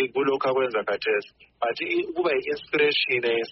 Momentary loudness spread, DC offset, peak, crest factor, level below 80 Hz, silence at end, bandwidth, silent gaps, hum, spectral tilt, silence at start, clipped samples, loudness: 6 LU; under 0.1%; -10 dBFS; 16 dB; -66 dBFS; 0 s; 6 kHz; none; none; -1 dB/octave; 0 s; under 0.1%; -24 LUFS